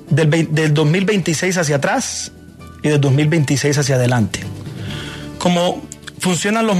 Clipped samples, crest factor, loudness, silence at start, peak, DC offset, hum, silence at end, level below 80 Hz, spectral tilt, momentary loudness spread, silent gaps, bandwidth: under 0.1%; 14 dB; -17 LUFS; 0 s; -2 dBFS; under 0.1%; none; 0 s; -48 dBFS; -5 dB/octave; 13 LU; none; 14 kHz